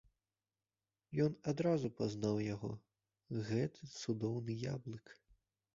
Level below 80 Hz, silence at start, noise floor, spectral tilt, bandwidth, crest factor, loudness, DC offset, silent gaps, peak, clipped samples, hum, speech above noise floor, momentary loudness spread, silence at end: -70 dBFS; 1.1 s; under -90 dBFS; -7.5 dB/octave; 7.4 kHz; 18 dB; -40 LUFS; under 0.1%; none; -22 dBFS; under 0.1%; none; over 51 dB; 10 LU; 0.65 s